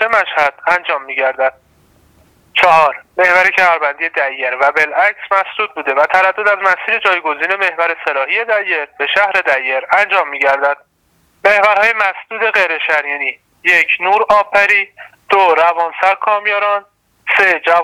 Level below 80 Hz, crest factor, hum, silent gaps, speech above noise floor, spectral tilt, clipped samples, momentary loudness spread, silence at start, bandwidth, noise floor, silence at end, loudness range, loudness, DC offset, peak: -58 dBFS; 14 dB; none; none; 44 dB; -2 dB/octave; under 0.1%; 7 LU; 0 s; 16.5 kHz; -57 dBFS; 0 s; 2 LU; -13 LUFS; under 0.1%; 0 dBFS